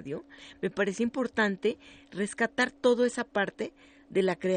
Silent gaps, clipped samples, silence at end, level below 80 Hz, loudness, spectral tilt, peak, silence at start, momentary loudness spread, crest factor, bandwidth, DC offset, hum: none; under 0.1%; 0 s; -68 dBFS; -29 LUFS; -5 dB/octave; -12 dBFS; 0 s; 14 LU; 18 dB; 9.4 kHz; under 0.1%; none